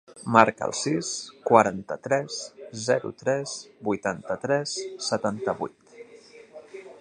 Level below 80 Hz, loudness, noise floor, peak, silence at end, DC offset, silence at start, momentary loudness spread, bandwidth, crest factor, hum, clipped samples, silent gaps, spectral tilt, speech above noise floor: -66 dBFS; -26 LUFS; -50 dBFS; 0 dBFS; 0.05 s; under 0.1%; 0.1 s; 15 LU; 11 kHz; 26 dB; none; under 0.1%; none; -4 dB/octave; 24 dB